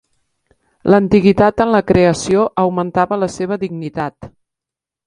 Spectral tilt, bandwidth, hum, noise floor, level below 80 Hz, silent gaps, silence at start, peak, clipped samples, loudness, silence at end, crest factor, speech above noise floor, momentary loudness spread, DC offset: -6.5 dB/octave; 10.5 kHz; none; -86 dBFS; -42 dBFS; none; 0.85 s; 0 dBFS; under 0.1%; -15 LUFS; 0.8 s; 16 dB; 72 dB; 12 LU; under 0.1%